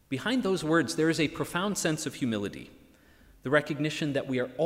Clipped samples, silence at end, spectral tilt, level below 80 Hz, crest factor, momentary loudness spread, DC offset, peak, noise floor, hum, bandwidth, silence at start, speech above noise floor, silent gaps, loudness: under 0.1%; 0 s; -4.5 dB/octave; -60 dBFS; 20 dB; 6 LU; under 0.1%; -10 dBFS; -58 dBFS; none; 16 kHz; 0.1 s; 29 dB; none; -29 LUFS